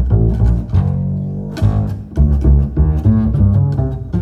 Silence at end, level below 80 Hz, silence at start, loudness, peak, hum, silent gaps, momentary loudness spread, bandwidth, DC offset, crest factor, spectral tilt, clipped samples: 0 s; -18 dBFS; 0 s; -15 LUFS; -2 dBFS; none; none; 7 LU; 5.8 kHz; under 0.1%; 12 dB; -10.5 dB/octave; under 0.1%